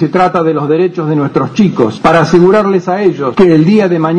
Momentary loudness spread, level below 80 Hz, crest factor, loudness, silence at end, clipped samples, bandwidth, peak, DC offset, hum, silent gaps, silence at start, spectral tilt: 5 LU; -42 dBFS; 8 dB; -10 LUFS; 0 s; 0.6%; 9.6 kHz; 0 dBFS; under 0.1%; none; none; 0 s; -7.5 dB/octave